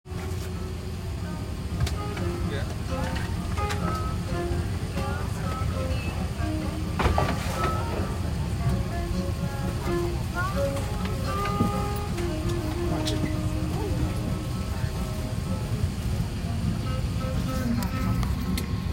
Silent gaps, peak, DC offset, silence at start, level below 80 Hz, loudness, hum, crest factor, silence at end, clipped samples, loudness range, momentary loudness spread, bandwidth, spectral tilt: none; -8 dBFS; under 0.1%; 0.05 s; -34 dBFS; -29 LUFS; none; 20 dB; 0 s; under 0.1%; 2 LU; 4 LU; 16 kHz; -6 dB/octave